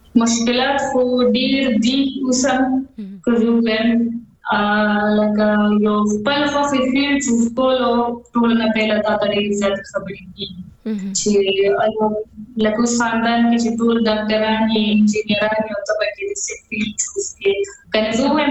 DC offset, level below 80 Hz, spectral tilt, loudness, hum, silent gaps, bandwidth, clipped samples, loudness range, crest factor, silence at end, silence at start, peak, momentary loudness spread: under 0.1%; -48 dBFS; -4 dB/octave; -17 LUFS; none; none; 8.4 kHz; under 0.1%; 3 LU; 16 dB; 0 s; 0.15 s; -2 dBFS; 8 LU